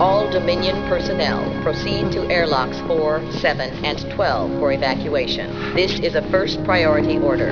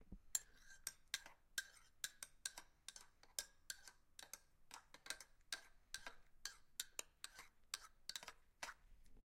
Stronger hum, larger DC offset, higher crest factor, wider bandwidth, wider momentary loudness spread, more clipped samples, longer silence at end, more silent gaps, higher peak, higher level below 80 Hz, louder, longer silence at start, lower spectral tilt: neither; first, 0.7% vs under 0.1%; second, 16 dB vs 32 dB; second, 5.4 kHz vs 16.5 kHz; second, 5 LU vs 12 LU; neither; about the same, 0 s vs 0.1 s; neither; first, -2 dBFS vs -24 dBFS; first, -38 dBFS vs -72 dBFS; first, -19 LUFS vs -53 LUFS; about the same, 0 s vs 0 s; first, -6 dB/octave vs 1 dB/octave